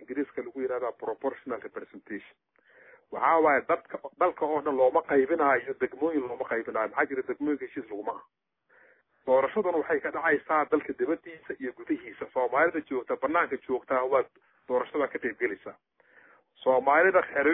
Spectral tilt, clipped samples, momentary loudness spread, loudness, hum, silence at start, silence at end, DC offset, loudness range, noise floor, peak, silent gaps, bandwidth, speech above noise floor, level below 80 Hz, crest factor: -9 dB/octave; under 0.1%; 14 LU; -28 LUFS; none; 0 s; 0 s; under 0.1%; 5 LU; -62 dBFS; -10 dBFS; none; 3.9 kHz; 34 dB; -72 dBFS; 18 dB